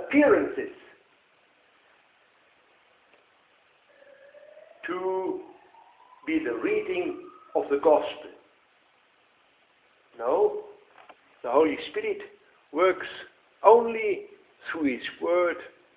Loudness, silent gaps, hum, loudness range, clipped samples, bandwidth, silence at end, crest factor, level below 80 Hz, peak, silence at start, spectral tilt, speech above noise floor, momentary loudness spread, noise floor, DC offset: -26 LUFS; none; none; 12 LU; under 0.1%; 4 kHz; 0.3 s; 26 dB; -68 dBFS; -4 dBFS; 0 s; -8.5 dB/octave; 39 dB; 19 LU; -64 dBFS; under 0.1%